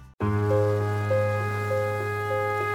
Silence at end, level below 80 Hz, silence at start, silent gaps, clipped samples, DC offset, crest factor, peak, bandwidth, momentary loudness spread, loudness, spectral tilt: 0 s; -54 dBFS; 0 s; 0.14-0.18 s; under 0.1%; under 0.1%; 12 dB; -12 dBFS; 16 kHz; 4 LU; -26 LUFS; -7.5 dB/octave